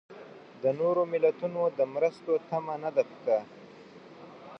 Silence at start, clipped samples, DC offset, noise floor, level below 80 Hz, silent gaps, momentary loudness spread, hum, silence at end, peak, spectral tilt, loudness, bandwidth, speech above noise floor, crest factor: 0.1 s; under 0.1%; under 0.1%; -50 dBFS; -82 dBFS; none; 22 LU; none; 0 s; -12 dBFS; -7.5 dB/octave; -29 LUFS; 6.4 kHz; 22 dB; 18 dB